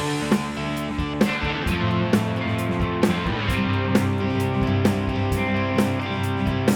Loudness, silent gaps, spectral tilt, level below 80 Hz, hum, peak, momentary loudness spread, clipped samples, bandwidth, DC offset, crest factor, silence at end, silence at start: -23 LUFS; none; -6.5 dB/octave; -36 dBFS; none; -4 dBFS; 4 LU; under 0.1%; 19 kHz; under 0.1%; 18 dB; 0 s; 0 s